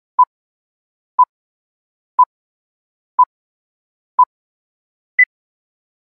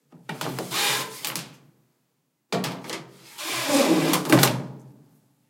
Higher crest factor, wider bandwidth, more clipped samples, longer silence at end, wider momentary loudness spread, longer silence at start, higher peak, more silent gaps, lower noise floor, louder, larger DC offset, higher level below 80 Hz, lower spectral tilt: second, 18 dB vs 26 dB; second, 2.8 kHz vs 17 kHz; neither; first, 0.75 s vs 0.55 s; second, 9 LU vs 19 LU; about the same, 0.2 s vs 0.15 s; about the same, -2 dBFS vs 0 dBFS; first, 0.27-1.18 s, 1.29-2.18 s, 2.26-3.18 s, 3.26-4.18 s, 4.26-5.18 s vs none; first, under -90 dBFS vs -73 dBFS; first, -17 LUFS vs -24 LUFS; neither; second, -82 dBFS vs -72 dBFS; about the same, -2.5 dB/octave vs -3.5 dB/octave